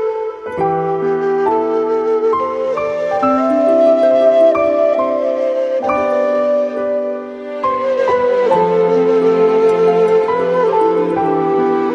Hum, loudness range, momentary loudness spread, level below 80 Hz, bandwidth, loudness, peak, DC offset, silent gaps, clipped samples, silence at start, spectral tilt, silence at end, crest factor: none; 3 LU; 7 LU; -54 dBFS; 9.6 kHz; -14 LUFS; -2 dBFS; under 0.1%; none; under 0.1%; 0 s; -7 dB/octave; 0 s; 12 dB